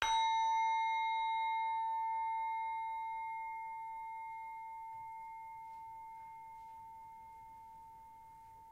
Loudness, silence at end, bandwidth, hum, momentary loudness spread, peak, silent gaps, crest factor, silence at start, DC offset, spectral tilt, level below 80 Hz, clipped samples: -38 LUFS; 0 s; 12 kHz; none; 21 LU; -16 dBFS; none; 24 dB; 0 s; under 0.1%; 0.5 dB/octave; -72 dBFS; under 0.1%